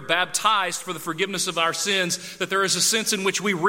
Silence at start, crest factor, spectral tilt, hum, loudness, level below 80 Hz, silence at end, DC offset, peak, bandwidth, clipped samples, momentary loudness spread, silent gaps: 0 s; 20 dB; -1.5 dB/octave; none; -22 LUFS; -68 dBFS; 0 s; under 0.1%; -4 dBFS; 16.5 kHz; under 0.1%; 8 LU; none